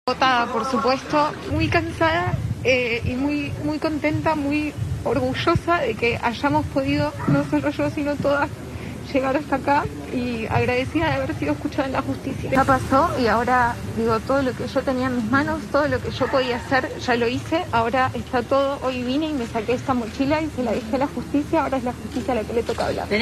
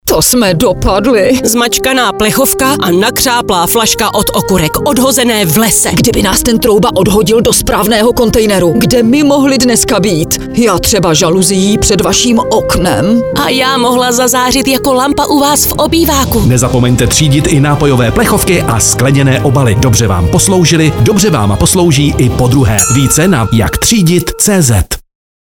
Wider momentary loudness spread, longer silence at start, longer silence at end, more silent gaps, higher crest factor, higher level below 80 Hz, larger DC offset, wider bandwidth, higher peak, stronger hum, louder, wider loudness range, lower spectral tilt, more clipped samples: first, 6 LU vs 3 LU; about the same, 0.05 s vs 0.05 s; second, 0 s vs 0.55 s; neither; first, 16 dB vs 8 dB; second, -40 dBFS vs -24 dBFS; neither; second, 13.5 kHz vs over 20 kHz; second, -6 dBFS vs 0 dBFS; neither; second, -22 LUFS vs -8 LUFS; about the same, 2 LU vs 1 LU; first, -6 dB/octave vs -4 dB/octave; neither